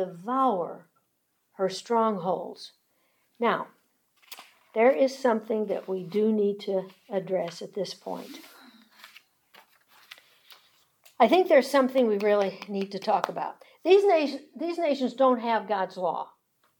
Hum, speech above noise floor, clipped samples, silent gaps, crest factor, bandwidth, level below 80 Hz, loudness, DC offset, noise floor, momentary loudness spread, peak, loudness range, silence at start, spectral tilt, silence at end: none; 49 dB; under 0.1%; none; 20 dB; 19 kHz; -90 dBFS; -26 LUFS; under 0.1%; -74 dBFS; 17 LU; -6 dBFS; 11 LU; 0 s; -5.5 dB/octave; 0.55 s